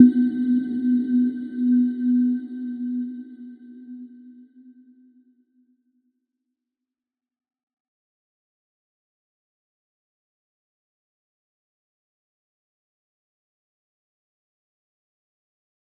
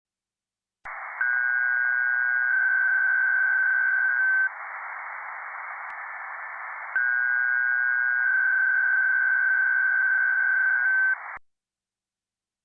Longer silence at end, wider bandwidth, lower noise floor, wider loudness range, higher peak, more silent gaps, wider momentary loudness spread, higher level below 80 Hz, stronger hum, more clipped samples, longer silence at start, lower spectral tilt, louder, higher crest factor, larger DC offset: first, 11.7 s vs 1.25 s; first, 4 kHz vs 2.6 kHz; about the same, -89 dBFS vs under -90 dBFS; first, 23 LU vs 6 LU; first, -2 dBFS vs -16 dBFS; neither; first, 21 LU vs 14 LU; second, -84 dBFS vs -78 dBFS; neither; neither; second, 0 s vs 0.85 s; first, -9.5 dB/octave vs -2.5 dB/octave; about the same, -22 LUFS vs -22 LUFS; first, 26 dB vs 10 dB; neither